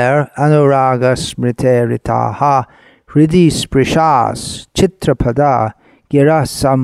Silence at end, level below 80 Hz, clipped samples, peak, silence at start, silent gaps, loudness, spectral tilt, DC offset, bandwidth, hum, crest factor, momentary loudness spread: 0 s; -36 dBFS; under 0.1%; 0 dBFS; 0 s; none; -13 LUFS; -6 dB/octave; under 0.1%; 13.5 kHz; none; 12 dB; 8 LU